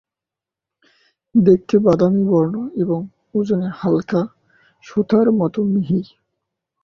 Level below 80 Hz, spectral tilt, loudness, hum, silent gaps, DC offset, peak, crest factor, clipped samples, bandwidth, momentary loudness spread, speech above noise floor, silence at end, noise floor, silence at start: -56 dBFS; -9.5 dB/octave; -18 LUFS; none; none; under 0.1%; -2 dBFS; 16 dB; under 0.1%; 6.8 kHz; 10 LU; 71 dB; 0.8 s; -87 dBFS; 1.35 s